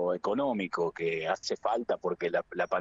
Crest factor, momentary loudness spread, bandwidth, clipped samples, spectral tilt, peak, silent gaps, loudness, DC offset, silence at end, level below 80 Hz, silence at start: 14 dB; 2 LU; 7.8 kHz; under 0.1%; -5 dB/octave; -16 dBFS; none; -31 LUFS; under 0.1%; 0 s; -70 dBFS; 0 s